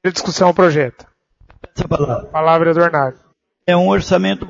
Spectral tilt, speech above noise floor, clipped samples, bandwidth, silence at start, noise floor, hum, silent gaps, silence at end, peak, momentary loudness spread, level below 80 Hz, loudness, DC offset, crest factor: -5.5 dB/octave; 35 dB; under 0.1%; 7.8 kHz; 0.05 s; -50 dBFS; none; none; 0 s; 0 dBFS; 11 LU; -42 dBFS; -15 LUFS; under 0.1%; 16 dB